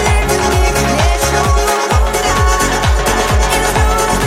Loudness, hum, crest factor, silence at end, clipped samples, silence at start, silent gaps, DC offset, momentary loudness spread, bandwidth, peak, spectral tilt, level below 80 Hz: -13 LUFS; none; 12 dB; 0 s; under 0.1%; 0 s; none; under 0.1%; 1 LU; 16.5 kHz; 0 dBFS; -4 dB/octave; -16 dBFS